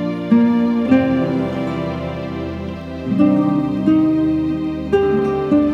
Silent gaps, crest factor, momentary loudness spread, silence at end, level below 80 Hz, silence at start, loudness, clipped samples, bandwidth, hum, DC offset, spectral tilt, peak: none; 16 dB; 11 LU; 0 s; -42 dBFS; 0 s; -17 LUFS; under 0.1%; 6.8 kHz; none; under 0.1%; -9 dB/octave; -2 dBFS